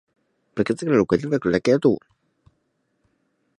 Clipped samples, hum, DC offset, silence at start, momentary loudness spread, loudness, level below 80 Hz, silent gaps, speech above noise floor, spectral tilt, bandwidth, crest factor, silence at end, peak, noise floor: under 0.1%; none; under 0.1%; 0.55 s; 9 LU; -21 LUFS; -56 dBFS; none; 51 dB; -7 dB/octave; 11 kHz; 18 dB; 1.6 s; -4 dBFS; -71 dBFS